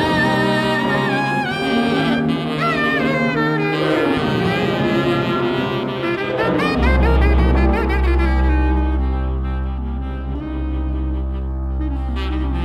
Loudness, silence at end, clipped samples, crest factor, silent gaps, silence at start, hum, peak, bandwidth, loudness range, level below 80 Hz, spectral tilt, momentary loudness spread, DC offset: -18 LUFS; 0 s; under 0.1%; 14 dB; none; 0 s; none; -4 dBFS; 9.8 kHz; 6 LU; -22 dBFS; -7 dB/octave; 8 LU; under 0.1%